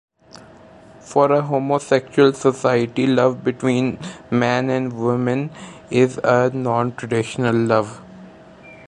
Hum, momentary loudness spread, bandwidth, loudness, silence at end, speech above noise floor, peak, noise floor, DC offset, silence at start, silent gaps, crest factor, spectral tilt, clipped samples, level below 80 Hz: none; 7 LU; 11 kHz; -19 LUFS; 0.1 s; 26 dB; -2 dBFS; -44 dBFS; under 0.1%; 1.05 s; none; 18 dB; -6.5 dB/octave; under 0.1%; -58 dBFS